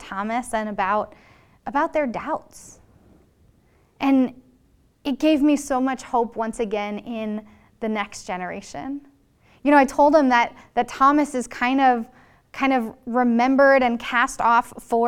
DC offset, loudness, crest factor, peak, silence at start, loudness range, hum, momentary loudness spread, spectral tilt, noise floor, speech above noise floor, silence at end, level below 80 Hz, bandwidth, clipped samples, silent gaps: under 0.1%; -21 LUFS; 20 dB; -2 dBFS; 0 s; 8 LU; none; 15 LU; -4.5 dB/octave; -59 dBFS; 38 dB; 0 s; -54 dBFS; 14.5 kHz; under 0.1%; none